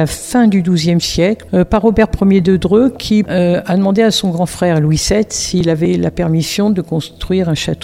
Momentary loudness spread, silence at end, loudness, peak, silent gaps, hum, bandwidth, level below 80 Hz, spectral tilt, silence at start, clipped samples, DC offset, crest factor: 4 LU; 0 s; -13 LUFS; 0 dBFS; none; none; 16 kHz; -32 dBFS; -5.5 dB/octave; 0 s; under 0.1%; under 0.1%; 12 dB